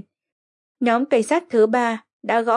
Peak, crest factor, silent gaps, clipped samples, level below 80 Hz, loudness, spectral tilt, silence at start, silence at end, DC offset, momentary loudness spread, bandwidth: -6 dBFS; 16 dB; 2.13-2.20 s; under 0.1%; -80 dBFS; -20 LUFS; -4.5 dB/octave; 0.8 s; 0 s; under 0.1%; 7 LU; 11.5 kHz